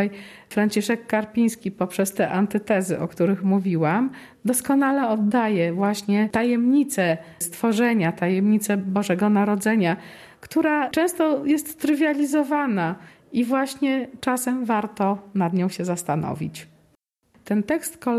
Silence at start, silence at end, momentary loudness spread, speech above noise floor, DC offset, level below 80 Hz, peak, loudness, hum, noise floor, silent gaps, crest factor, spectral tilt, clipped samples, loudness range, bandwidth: 0 s; 0 s; 7 LU; 42 dB; under 0.1%; -64 dBFS; -8 dBFS; -22 LUFS; none; -64 dBFS; none; 14 dB; -5.5 dB/octave; under 0.1%; 3 LU; 14 kHz